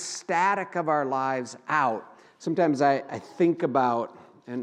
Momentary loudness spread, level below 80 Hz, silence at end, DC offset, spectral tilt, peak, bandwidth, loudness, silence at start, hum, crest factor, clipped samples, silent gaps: 13 LU; -84 dBFS; 0 s; under 0.1%; -5 dB/octave; -8 dBFS; 10.5 kHz; -26 LUFS; 0 s; none; 18 dB; under 0.1%; none